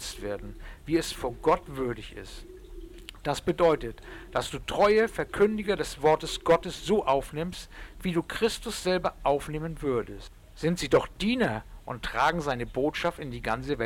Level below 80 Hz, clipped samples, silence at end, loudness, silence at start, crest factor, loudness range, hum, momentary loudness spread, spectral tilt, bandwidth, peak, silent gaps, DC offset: -46 dBFS; under 0.1%; 0 s; -28 LUFS; 0 s; 16 dB; 5 LU; none; 17 LU; -5 dB/octave; 17 kHz; -14 dBFS; none; under 0.1%